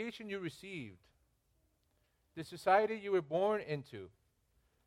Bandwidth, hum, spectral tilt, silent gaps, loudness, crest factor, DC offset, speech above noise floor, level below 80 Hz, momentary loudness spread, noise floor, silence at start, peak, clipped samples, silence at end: 15.5 kHz; none; -6 dB/octave; none; -36 LUFS; 22 dB; under 0.1%; 40 dB; -76 dBFS; 21 LU; -77 dBFS; 0 s; -16 dBFS; under 0.1%; 0.8 s